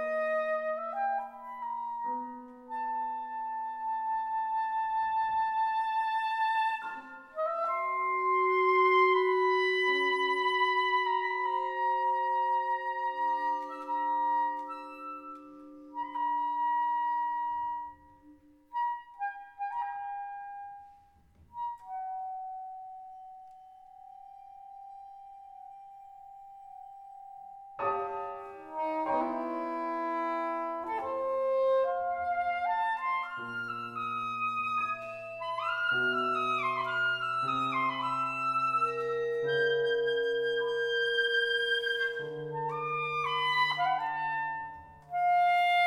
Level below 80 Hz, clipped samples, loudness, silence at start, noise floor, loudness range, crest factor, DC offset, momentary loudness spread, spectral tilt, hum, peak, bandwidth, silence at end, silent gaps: -74 dBFS; under 0.1%; -31 LUFS; 0 s; -61 dBFS; 15 LU; 16 dB; under 0.1%; 21 LU; -4.5 dB/octave; none; -14 dBFS; 12.5 kHz; 0 s; none